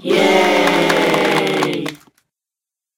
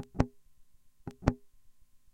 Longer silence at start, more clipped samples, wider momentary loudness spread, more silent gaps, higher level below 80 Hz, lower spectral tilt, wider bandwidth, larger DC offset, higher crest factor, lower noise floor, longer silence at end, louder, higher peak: about the same, 0 s vs 0 s; neither; second, 9 LU vs 16 LU; neither; second, -62 dBFS vs -46 dBFS; second, -4 dB/octave vs -8 dB/octave; first, 17 kHz vs 11.5 kHz; neither; second, 16 dB vs 32 dB; first, -87 dBFS vs -57 dBFS; first, 1 s vs 0.45 s; first, -14 LUFS vs -35 LUFS; first, 0 dBFS vs -6 dBFS